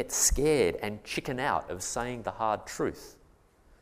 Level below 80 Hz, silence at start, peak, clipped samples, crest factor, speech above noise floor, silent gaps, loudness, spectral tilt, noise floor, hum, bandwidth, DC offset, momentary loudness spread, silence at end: -42 dBFS; 0 s; -12 dBFS; under 0.1%; 20 dB; 31 dB; none; -30 LUFS; -3 dB/octave; -61 dBFS; none; 15.5 kHz; under 0.1%; 10 LU; 0.7 s